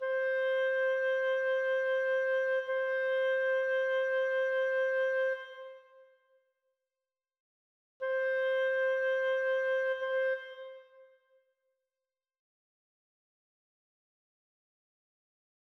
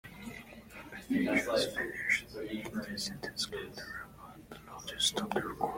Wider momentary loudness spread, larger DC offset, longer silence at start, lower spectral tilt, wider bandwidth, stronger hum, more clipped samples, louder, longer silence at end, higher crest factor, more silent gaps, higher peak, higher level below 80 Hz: second, 7 LU vs 19 LU; neither; about the same, 0 s vs 0.05 s; second, 0 dB/octave vs -3 dB/octave; second, 6.2 kHz vs 16.5 kHz; neither; neither; first, -31 LUFS vs -34 LUFS; first, 4.6 s vs 0 s; second, 8 dB vs 20 dB; first, 7.40-8.00 s vs none; second, -24 dBFS vs -16 dBFS; second, -82 dBFS vs -60 dBFS